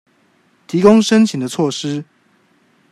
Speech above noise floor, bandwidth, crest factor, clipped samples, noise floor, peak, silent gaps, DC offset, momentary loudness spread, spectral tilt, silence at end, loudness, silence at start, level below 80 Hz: 43 dB; 12.5 kHz; 16 dB; under 0.1%; -57 dBFS; 0 dBFS; none; under 0.1%; 13 LU; -5.5 dB/octave; 0.9 s; -14 LUFS; 0.7 s; -58 dBFS